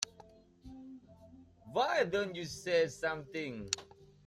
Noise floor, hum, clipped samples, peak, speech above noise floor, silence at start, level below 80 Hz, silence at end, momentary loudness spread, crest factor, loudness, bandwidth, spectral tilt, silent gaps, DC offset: -60 dBFS; none; under 0.1%; -12 dBFS; 25 dB; 0 s; -66 dBFS; 0.2 s; 21 LU; 26 dB; -35 LUFS; 13.5 kHz; -3 dB/octave; none; under 0.1%